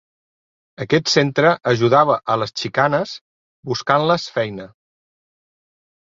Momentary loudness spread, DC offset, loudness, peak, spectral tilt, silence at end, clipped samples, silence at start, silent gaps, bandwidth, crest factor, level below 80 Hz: 15 LU; under 0.1%; -18 LUFS; -2 dBFS; -5 dB/octave; 1.45 s; under 0.1%; 0.8 s; 3.21-3.63 s; 7.8 kHz; 18 dB; -58 dBFS